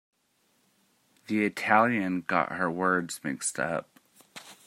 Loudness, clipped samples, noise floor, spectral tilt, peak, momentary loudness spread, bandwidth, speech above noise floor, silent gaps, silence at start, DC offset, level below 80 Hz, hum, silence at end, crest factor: -28 LUFS; under 0.1%; -71 dBFS; -4.5 dB/octave; -6 dBFS; 13 LU; 16 kHz; 43 dB; none; 1.3 s; under 0.1%; -74 dBFS; none; 0.15 s; 24 dB